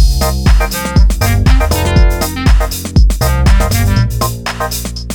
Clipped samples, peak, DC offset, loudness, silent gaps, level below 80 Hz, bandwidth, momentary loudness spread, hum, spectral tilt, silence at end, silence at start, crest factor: under 0.1%; 0 dBFS; under 0.1%; -12 LUFS; none; -12 dBFS; 19 kHz; 6 LU; none; -5 dB/octave; 0 s; 0 s; 10 dB